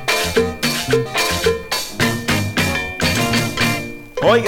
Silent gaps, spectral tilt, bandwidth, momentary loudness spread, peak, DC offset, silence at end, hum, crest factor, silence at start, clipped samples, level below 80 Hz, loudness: none; -3.5 dB/octave; 19 kHz; 3 LU; -2 dBFS; under 0.1%; 0 s; none; 16 dB; 0 s; under 0.1%; -38 dBFS; -18 LUFS